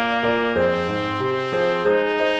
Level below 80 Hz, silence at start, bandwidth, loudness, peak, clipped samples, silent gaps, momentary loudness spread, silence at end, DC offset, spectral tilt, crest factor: -52 dBFS; 0 s; 8.6 kHz; -21 LUFS; -6 dBFS; under 0.1%; none; 4 LU; 0 s; under 0.1%; -6 dB/octave; 14 dB